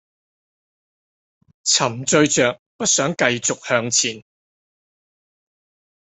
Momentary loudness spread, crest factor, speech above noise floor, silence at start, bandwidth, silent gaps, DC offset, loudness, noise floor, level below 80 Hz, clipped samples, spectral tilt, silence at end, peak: 7 LU; 22 dB; over 71 dB; 1.65 s; 8.6 kHz; 2.59-2.79 s; under 0.1%; -18 LUFS; under -90 dBFS; -62 dBFS; under 0.1%; -2.5 dB/octave; 1.95 s; -2 dBFS